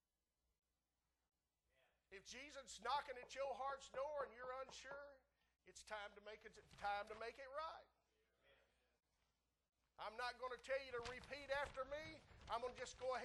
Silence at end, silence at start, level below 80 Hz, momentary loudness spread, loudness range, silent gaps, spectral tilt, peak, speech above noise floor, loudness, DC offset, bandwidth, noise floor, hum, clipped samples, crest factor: 0 s; 2.1 s; -74 dBFS; 13 LU; 5 LU; none; -2.5 dB/octave; -32 dBFS; over 39 dB; -51 LUFS; under 0.1%; 12 kHz; under -90 dBFS; none; under 0.1%; 20 dB